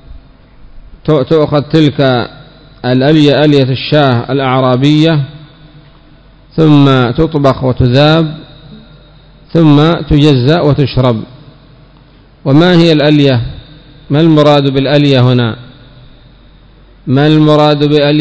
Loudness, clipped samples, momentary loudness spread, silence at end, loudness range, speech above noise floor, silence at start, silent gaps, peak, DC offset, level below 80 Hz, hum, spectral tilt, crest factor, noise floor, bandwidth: -9 LUFS; 3%; 9 LU; 0 s; 2 LU; 33 dB; 0.1 s; none; 0 dBFS; under 0.1%; -32 dBFS; none; -8 dB/octave; 10 dB; -40 dBFS; 8 kHz